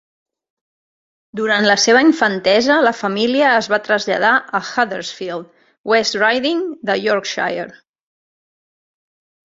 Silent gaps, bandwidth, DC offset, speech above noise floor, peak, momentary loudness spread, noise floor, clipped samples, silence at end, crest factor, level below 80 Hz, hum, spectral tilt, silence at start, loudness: 5.78-5.84 s; 7.8 kHz; under 0.1%; over 74 dB; 0 dBFS; 14 LU; under -90 dBFS; under 0.1%; 1.75 s; 18 dB; -64 dBFS; none; -3 dB/octave; 1.35 s; -15 LUFS